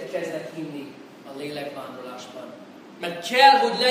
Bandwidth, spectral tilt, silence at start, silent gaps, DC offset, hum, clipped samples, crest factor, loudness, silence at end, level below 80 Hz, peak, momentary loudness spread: 15.5 kHz; -3 dB/octave; 0 s; none; under 0.1%; none; under 0.1%; 24 dB; -21 LUFS; 0 s; -78 dBFS; 0 dBFS; 26 LU